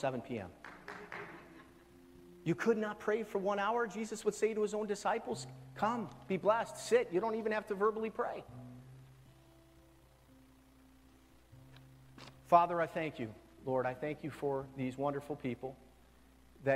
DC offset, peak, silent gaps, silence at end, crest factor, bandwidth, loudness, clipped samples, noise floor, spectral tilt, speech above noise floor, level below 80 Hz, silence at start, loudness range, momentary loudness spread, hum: under 0.1%; -14 dBFS; none; 0 s; 24 dB; 15.5 kHz; -36 LUFS; under 0.1%; -63 dBFS; -5.5 dB/octave; 28 dB; -68 dBFS; 0 s; 5 LU; 17 LU; none